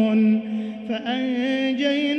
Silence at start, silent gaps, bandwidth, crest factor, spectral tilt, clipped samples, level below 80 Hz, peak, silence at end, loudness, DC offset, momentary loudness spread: 0 s; none; 6.4 kHz; 12 dB; -6.5 dB/octave; under 0.1%; -68 dBFS; -10 dBFS; 0 s; -23 LUFS; under 0.1%; 9 LU